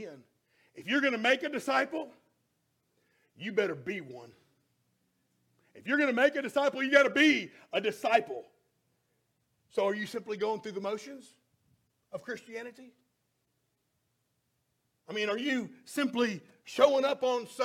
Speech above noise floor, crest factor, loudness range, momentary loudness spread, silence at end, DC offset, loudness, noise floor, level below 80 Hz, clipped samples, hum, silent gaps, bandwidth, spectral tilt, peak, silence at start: 48 dB; 24 dB; 16 LU; 19 LU; 0 s; under 0.1%; -30 LUFS; -79 dBFS; -82 dBFS; under 0.1%; none; none; 16 kHz; -4 dB/octave; -8 dBFS; 0 s